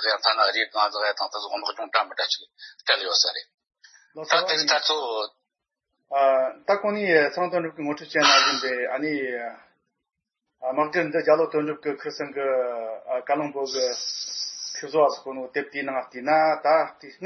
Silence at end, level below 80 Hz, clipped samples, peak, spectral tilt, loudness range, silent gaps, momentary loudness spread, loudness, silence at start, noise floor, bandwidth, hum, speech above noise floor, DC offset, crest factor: 0 s; -84 dBFS; under 0.1%; -2 dBFS; -2 dB/octave; 5 LU; 3.54-3.58 s; 11 LU; -24 LUFS; 0 s; -84 dBFS; 6.4 kHz; none; 60 dB; under 0.1%; 22 dB